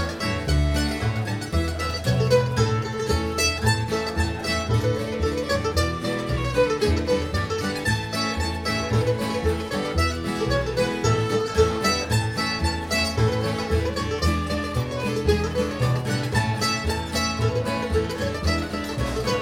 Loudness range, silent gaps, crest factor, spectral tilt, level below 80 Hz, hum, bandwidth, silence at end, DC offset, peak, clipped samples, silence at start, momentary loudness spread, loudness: 1 LU; none; 16 dB; -5 dB/octave; -36 dBFS; none; 17 kHz; 0 s; under 0.1%; -6 dBFS; under 0.1%; 0 s; 5 LU; -24 LUFS